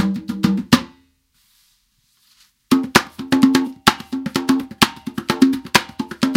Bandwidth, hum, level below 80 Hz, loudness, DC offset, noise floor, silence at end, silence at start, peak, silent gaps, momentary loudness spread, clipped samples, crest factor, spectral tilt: 17 kHz; none; -50 dBFS; -18 LUFS; under 0.1%; -62 dBFS; 0 s; 0 s; 0 dBFS; none; 9 LU; under 0.1%; 20 dB; -4 dB/octave